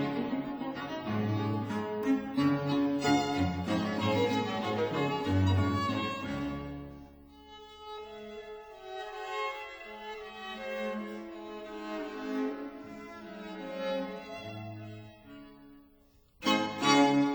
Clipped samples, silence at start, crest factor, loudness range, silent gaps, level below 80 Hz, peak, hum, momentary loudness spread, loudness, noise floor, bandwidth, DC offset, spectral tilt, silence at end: under 0.1%; 0 s; 22 dB; 12 LU; none; -60 dBFS; -10 dBFS; none; 17 LU; -32 LUFS; -63 dBFS; over 20 kHz; under 0.1%; -5.5 dB/octave; 0 s